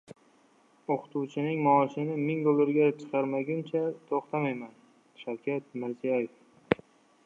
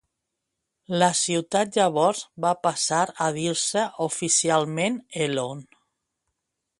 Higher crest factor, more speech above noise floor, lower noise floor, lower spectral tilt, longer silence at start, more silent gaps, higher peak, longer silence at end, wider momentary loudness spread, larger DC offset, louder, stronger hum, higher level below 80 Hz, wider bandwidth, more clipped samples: first, 26 dB vs 20 dB; second, 35 dB vs 58 dB; second, -63 dBFS vs -82 dBFS; first, -8.5 dB/octave vs -3 dB/octave; second, 0.1 s vs 0.9 s; neither; about the same, -4 dBFS vs -4 dBFS; second, 0.5 s vs 1.15 s; first, 13 LU vs 7 LU; neither; second, -30 LUFS vs -23 LUFS; neither; about the same, -70 dBFS vs -68 dBFS; second, 7.6 kHz vs 11.5 kHz; neither